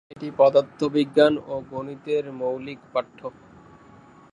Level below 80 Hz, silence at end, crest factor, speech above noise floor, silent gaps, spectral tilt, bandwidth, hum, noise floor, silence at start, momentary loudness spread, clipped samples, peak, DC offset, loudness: -64 dBFS; 1 s; 20 dB; 27 dB; none; -6.5 dB/octave; 10 kHz; none; -50 dBFS; 0.15 s; 16 LU; under 0.1%; -4 dBFS; under 0.1%; -23 LUFS